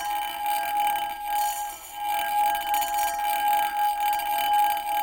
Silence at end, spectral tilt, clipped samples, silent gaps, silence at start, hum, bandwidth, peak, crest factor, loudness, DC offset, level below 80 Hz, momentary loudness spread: 0 s; 0.5 dB/octave; under 0.1%; none; 0 s; none; 17.5 kHz; -12 dBFS; 14 dB; -25 LUFS; under 0.1%; -58 dBFS; 6 LU